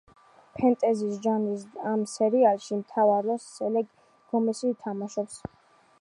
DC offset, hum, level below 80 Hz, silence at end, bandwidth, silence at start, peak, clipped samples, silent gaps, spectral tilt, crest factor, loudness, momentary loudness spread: under 0.1%; none; -68 dBFS; 0.65 s; 11.5 kHz; 0.55 s; -10 dBFS; under 0.1%; none; -6 dB/octave; 18 dB; -27 LUFS; 11 LU